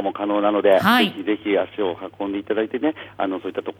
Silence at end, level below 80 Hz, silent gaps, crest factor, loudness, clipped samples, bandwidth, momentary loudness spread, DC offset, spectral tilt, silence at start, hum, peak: 0.1 s; -64 dBFS; none; 18 dB; -21 LUFS; under 0.1%; 16.5 kHz; 11 LU; under 0.1%; -5.5 dB/octave; 0 s; none; -4 dBFS